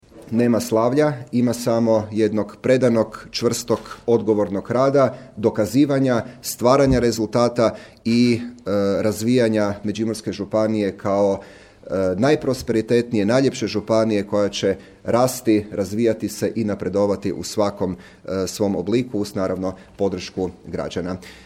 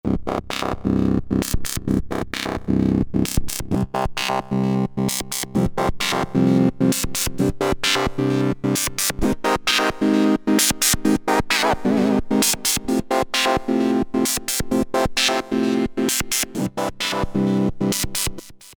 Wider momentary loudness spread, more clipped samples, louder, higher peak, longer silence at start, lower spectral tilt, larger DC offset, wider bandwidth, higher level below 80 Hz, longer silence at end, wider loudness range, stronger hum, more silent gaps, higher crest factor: first, 9 LU vs 6 LU; neither; about the same, -21 LUFS vs -20 LUFS; about the same, -2 dBFS vs 0 dBFS; about the same, 0.15 s vs 0.05 s; first, -6 dB/octave vs -4 dB/octave; neither; second, 16.5 kHz vs over 20 kHz; second, -46 dBFS vs -36 dBFS; about the same, 0.1 s vs 0.05 s; about the same, 4 LU vs 4 LU; neither; neither; about the same, 18 dB vs 20 dB